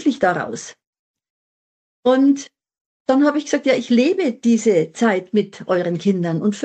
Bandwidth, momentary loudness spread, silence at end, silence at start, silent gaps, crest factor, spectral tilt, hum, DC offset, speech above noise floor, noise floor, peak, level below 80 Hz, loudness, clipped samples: 8.8 kHz; 8 LU; 0 s; 0 s; 0.87-0.93 s, 0.99-1.14 s, 1.30-2.03 s, 2.81-3.05 s; 14 dB; -5.5 dB/octave; none; under 0.1%; over 73 dB; under -90 dBFS; -4 dBFS; -66 dBFS; -18 LUFS; under 0.1%